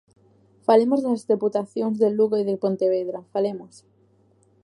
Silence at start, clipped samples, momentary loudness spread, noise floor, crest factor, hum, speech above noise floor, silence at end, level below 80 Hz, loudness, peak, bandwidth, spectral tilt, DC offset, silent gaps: 0.7 s; under 0.1%; 9 LU; -60 dBFS; 18 dB; none; 38 dB; 0.95 s; -76 dBFS; -22 LUFS; -4 dBFS; 11 kHz; -7.5 dB/octave; under 0.1%; none